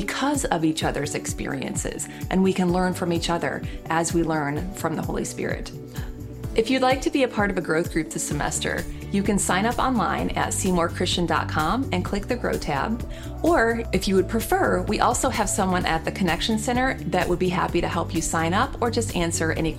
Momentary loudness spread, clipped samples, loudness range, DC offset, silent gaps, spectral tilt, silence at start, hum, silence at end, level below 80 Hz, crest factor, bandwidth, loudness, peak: 7 LU; under 0.1%; 3 LU; under 0.1%; none; -4.5 dB/octave; 0 s; none; 0 s; -38 dBFS; 20 dB; 16.5 kHz; -24 LUFS; -4 dBFS